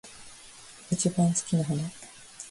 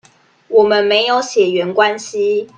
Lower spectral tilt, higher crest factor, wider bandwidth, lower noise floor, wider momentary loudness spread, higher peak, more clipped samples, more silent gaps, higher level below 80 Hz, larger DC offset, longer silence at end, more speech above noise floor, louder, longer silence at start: first, -5.5 dB/octave vs -3.5 dB/octave; about the same, 18 dB vs 14 dB; first, 11.5 kHz vs 9.2 kHz; first, -49 dBFS vs -43 dBFS; first, 22 LU vs 5 LU; second, -12 dBFS vs 0 dBFS; neither; neither; about the same, -64 dBFS vs -64 dBFS; neither; about the same, 0 s vs 0.1 s; second, 22 dB vs 29 dB; second, -28 LUFS vs -14 LUFS; second, 0.05 s vs 0.5 s